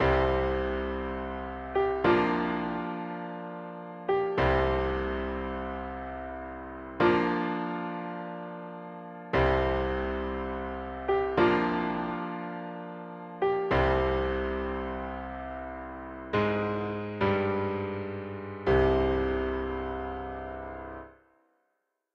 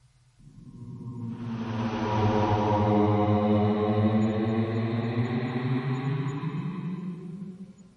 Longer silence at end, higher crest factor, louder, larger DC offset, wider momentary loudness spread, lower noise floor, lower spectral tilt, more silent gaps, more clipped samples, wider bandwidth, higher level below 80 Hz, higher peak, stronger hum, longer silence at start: first, 1 s vs 0.15 s; about the same, 20 dB vs 16 dB; second, -30 LUFS vs -27 LUFS; neither; about the same, 15 LU vs 16 LU; first, -79 dBFS vs -56 dBFS; about the same, -8.5 dB/octave vs -8.5 dB/octave; neither; neither; second, 6.4 kHz vs 7.4 kHz; first, -42 dBFS vs -56 dBFS; about the same, -10 dBFS vs -10 dBFS; neither; second, 0 s vs 0.45 s